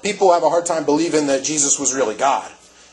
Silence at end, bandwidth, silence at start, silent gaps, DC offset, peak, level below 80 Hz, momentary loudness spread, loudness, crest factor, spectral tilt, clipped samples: 0.4 s; 10.5 kHz; 0.05 s; none; under 0.1%; -2 dBFS; -60 dBFS; 4 LU; -17 LUFS; 16 dB; -2.5 dB/octave; under 0.1%